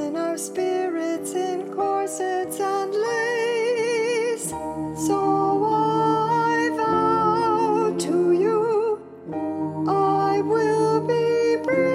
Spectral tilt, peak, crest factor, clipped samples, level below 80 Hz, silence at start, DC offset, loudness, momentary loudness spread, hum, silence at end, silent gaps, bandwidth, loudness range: -5 dB/octave; -10 dBFS; 12 dB; under 0.1%; -60 dBFS; 0 s; under 0.1%; -22 LUFS; 7 LU; none; 0 s; none; 15.5 kHz; 4 LU